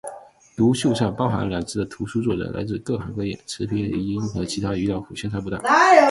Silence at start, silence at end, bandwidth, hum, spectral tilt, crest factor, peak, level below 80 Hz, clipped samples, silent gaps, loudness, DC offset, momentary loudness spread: 0.05 s; 0 s; 11.5 kHz; none; -5.5 dB/octave; 20 dB; 0 dBFS; -46 dBFS; under 0.1%; none; -22 LUFS; under 0.1%; 10 LU